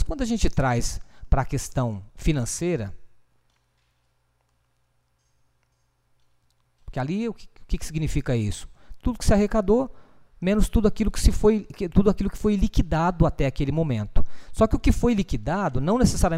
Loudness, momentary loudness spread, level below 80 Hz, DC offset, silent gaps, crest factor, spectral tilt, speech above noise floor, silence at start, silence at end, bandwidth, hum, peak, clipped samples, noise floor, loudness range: -24 LUFS; 11 LU; -30 dBFS; under 0.1%; none; 20 dB; -6.5 dB/octave; 47 dB; 0 s; 0 s; 15 kHz; none; -4 dBFS; under 0.1%; -68 dBFS; 12 LU